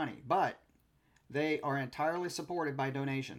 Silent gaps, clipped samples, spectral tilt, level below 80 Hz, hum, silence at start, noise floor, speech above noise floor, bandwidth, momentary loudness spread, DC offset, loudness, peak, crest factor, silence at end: none; under 0.1%; -5.5 dB/octave; -74 dBFS; none; 0 s; -70 dBFS; 35 dB; 16 kHz; 5 LU; under 0.1%; -35 LUFS; -18 dBFS; 18 dB; 0 s